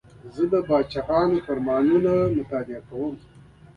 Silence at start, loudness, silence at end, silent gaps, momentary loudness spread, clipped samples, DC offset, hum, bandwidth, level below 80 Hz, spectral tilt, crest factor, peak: 0.25 s; -23 LUFS; 0.6 s; none; 12 LU; under 0.1%; under 0.1%; none; 6.8 kHz; -50 dBFS; -9 dB/octave; 14 dB; -8 dBFS